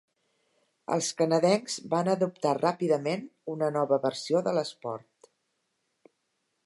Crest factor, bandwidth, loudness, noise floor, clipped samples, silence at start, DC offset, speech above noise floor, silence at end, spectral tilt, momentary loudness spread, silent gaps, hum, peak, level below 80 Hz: 18 dB; 11.5 kHz; -28 LUFS; -78 dBFS; under 0.1%; 0.9 s; under 0.1%; 51 dB; 1.65 s; -5 dB/octave; 12 LU; none; none; -10 dBFS; -82 dBFS